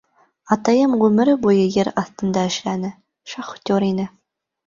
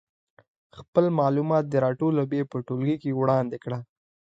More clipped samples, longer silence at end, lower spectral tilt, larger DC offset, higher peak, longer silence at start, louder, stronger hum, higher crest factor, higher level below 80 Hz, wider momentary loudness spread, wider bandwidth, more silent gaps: neither; about the same, 0.6 s vs 0.5 s; second, -6 dB/octave vs -9.5 dB/octave; neither; first, -2 dBFS vs -6 dBFS; second, 0.45 s vs 0.75 s; first, -19 LUFS vs -25 LUFS; neither; about the same, 16 dB vs 18 dB; first, -58 dBFS vs -66 dBFS; first, 15 LU vs 8 LU; about the same, 7.4 kHz vs 7.8 kHz; second, none vs 0.88-0.93 s